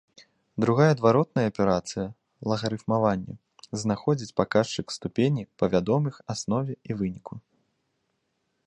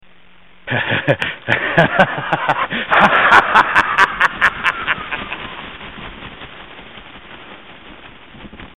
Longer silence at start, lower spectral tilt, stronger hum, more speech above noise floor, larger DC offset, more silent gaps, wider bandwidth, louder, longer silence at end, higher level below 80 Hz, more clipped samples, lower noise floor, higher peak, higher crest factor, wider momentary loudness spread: about the same, 0.55 s vs 0.65 s; first, -6.5 dB/octave vs -5 dB/octave; neither; first, 51 dB vs 35 dB; second, under 0.1% vs 0.6%; neither; second, 10.5 kHz vs 16.5 kHz; second, -26 LUFS vs -14 LUFS; first, 1.3 s vs 0.1 s; second, -56 dBFS vs -46 dBFS; neither; first, -76 dBFS vs -49 dBFS; second, -6 dBFS vs 0 dBFS; about the same, 22 dB vs 18 dB; second, 15 LU vs 25 LU